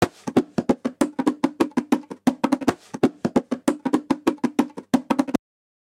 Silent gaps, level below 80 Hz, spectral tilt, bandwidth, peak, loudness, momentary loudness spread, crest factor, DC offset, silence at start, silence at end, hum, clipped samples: none; -58 dBFS; -6 dB/octave; 16.5 kHz; -6 dBFS; -24 LUFS; 3 LU; 18 dB; under 0.1%; 0 s; 0.55 s; none; under 0.1%